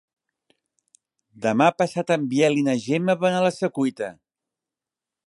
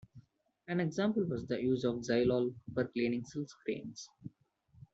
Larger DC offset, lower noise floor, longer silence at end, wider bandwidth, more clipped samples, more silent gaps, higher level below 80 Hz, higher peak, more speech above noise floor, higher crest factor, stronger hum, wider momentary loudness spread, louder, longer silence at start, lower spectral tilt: neither; first, -89 dBFS vs -68 dBFS; first, 1.15 s vs 0.65 s; first, 11.5 kHz vs 8 kHz; neither; neither; second, -72 dBFS vs -66 dBFS; first, -4 dBFS vs -20 dBFS; first, 67 dB vs 33 dB; about the same, 20 dB vs 16 dB; neither; second, 7 LU vs 16 LU; first, -22 LUFS vs -35 LUFS; first, 1.4 s vs 0.15 s; about the same, -6 dB/octave vs -6.5 dB/octave